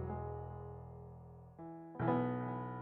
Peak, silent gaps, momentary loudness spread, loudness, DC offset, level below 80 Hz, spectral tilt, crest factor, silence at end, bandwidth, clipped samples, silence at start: -20 dBFS; none; 18 LU; -41 LUFS; under 0.1%; -60 dBFS; -8.5 dB/octave; 22 dB; 0 s; 4.1 kHz; under 0.1%; 0 s